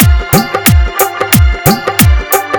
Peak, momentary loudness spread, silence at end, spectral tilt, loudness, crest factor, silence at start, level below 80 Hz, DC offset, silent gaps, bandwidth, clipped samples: 0 dBFS; 4 LU; 0 s; -4.5 dB/octave; -9 LUFS; 8 dB; 0 s; -14 dBFS; under 0.1%; none; over 20 kHz; 1%